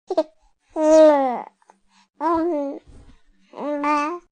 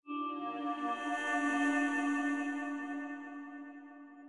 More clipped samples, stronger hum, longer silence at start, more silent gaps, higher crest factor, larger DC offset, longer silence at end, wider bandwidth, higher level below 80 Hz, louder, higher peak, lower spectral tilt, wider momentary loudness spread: neither; neither; about the same, 0.1 s vs 0.05 s; neither; about the same, 18 dB vs 14 dB; neither; first, 0.15 s vs 0 s; second, 9.6 kHz vs 11.5 kHz; first, -56 dBFS vs under -90 dBFS; first, -19 LUFS vs -35 LUFS; first, -2 dBFS vs -22 dBFS; first, -4.5 dB/octave vs -2.5 dB/octave; about the same, 19 LU vs 17 LU